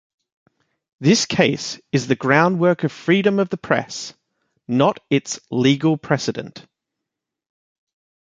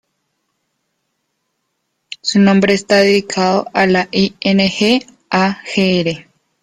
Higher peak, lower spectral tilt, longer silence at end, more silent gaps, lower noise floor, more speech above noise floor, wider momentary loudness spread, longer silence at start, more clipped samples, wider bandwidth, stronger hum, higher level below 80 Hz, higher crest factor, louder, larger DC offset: about the same, -2 dBFS vs 0 dBFS; about the same, -5 dB/octave vs -5 dB/octave; first, 1.6 s vs 0.4 s; neither; first, -83 dBFS vs -70 dBFS; first, 64 dB vs 57 dB; first, 11 LU vs 7 LU; second, 1 s vs 2.1 s; neither; second, 9.4 kHz vs 10.5 kHz; neither; second, -60 dBFS vs -52 dBFS; about the same, 18 dB vs 14 dB; second, -19 LUFS vs -14 LUFS; neither